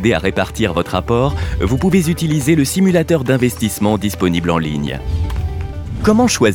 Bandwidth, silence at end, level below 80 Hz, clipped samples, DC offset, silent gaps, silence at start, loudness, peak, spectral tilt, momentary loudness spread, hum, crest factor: 19 kHz; 0 s; -30 dBFS; under 0.1%; under 0.1%; none; 0 s; -16 LUFS; 0 dBFS; -5.5 dB/octave; 8 LU; none; 14 dB